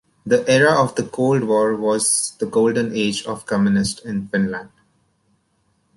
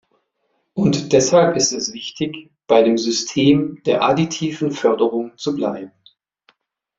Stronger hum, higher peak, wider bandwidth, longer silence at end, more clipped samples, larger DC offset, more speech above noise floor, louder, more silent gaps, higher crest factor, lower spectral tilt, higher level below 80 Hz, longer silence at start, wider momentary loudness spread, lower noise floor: neither; about the same, -4 dBFS vs -2 dBFS; first, 11.5 kHz vs 7.8 kHz; first, 1.3 s vs 1.1 s; neither; neither; second, 47 dB vs 52 dB; about the same, -19 LUFS vs -18 LUFS; neither; about the same, 16 dB vs 18 dB; about the same, -4.5 dB/octave vs -4.5 dB/octave; about the same, -54 dBFS vs -56 dBFS; second, 0.25 s vs 0.75 s; second, 9 LU vs 12 LU; second, -65 dBFS vs -69 dBFS